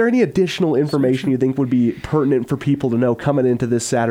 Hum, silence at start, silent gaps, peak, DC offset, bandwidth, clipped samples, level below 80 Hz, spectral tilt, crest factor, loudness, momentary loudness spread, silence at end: none; 0 s; none; -4 dBFS; under 0.1%; 15 kHz; under 0.1%; -48 dBFS; -6.5 dB/octave; 12 dB; -18 LUFS; 2 LU; 0 s